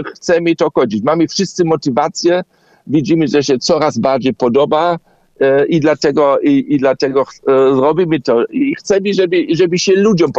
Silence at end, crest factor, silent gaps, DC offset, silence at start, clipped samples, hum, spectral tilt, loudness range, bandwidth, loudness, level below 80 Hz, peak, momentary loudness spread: 0 s; 12 dB; none; under 0.1%; 0 s; under 0.1%; none; -5.5 dB/octave; 2 LU; 8 kHz; -13 LUFS; -52 dBFS; 0 dBFS; 4 LU